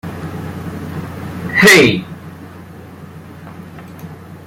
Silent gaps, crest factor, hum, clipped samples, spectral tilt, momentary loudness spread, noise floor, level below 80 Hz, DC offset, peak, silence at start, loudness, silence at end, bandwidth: none; 18 dB; none; under 0.1%; -4 dB/octave; 28 LU; -34 dBFS; -50 dBFS; under 0.1%; 0 dBFS; 0.05 s; -10 LUFS; 0 s; 16.5 kHz